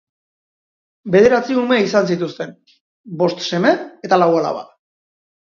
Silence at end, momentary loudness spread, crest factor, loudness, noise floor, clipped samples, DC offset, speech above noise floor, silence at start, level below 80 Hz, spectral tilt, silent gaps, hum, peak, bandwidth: 0.9 s; 17 LU; 18 dB; -16 LUFS; under -90 dBFS; under 0.1%; under 0.1%; over 74 dB; 1.05 s; -58 dBFS; -6 dB/octave; 2.80-3.04 s; none; 0 dBFS; 7.4 kHz